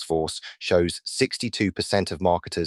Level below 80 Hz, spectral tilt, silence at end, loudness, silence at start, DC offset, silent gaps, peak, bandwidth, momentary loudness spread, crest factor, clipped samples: -50 dBFS; -4.5 dB/octave; 0 s; -25 LUFS; 0 s; under 0.1%; none; -6 dBFS; 13 kHz; 4 LU; 18 dB; under 0.1%